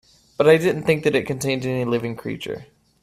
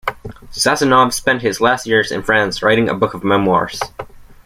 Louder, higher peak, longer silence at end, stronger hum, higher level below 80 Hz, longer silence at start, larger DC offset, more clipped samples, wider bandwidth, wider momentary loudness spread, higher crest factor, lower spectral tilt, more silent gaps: second, -21 LUFS vs -15 LUFS; about the same, -2 dBFS vs -2 dBFS; first, 0.4 s vs 0.15 s; neither; second, -56 dBFS vs -44 dBFS; first, 0.4 s vs 0.05 s; neither; neither; second, 14.5 kHz vs 16.5 kHz; about the same, 15 LU vs 13 LU; first, 20 dB vs 14 dB; first, -5.5 dB/octave vs -4 dB/octave; neither